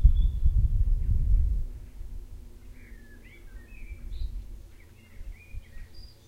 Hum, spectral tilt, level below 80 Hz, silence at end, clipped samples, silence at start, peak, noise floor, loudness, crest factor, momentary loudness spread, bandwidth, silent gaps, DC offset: none; -7.5 dB/octave; -28 dBFS; 0.2 s; under 0.1%; 0 s; -6 dBFS; -50 dBFS; -30 LUFS; 20 dB; 23 LU; 5.2 kHz; none; under 0.1%